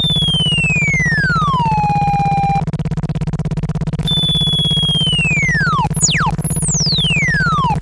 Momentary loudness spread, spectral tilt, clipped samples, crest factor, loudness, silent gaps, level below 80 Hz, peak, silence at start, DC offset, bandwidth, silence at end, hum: 7 LU; -3 dB/octave; under 0.1%; 14 dB; -14 LUFS; none; -30 dBFS; 0 dBFS; 0 s; under 0.1%; 11.5 kHz; 0 s; none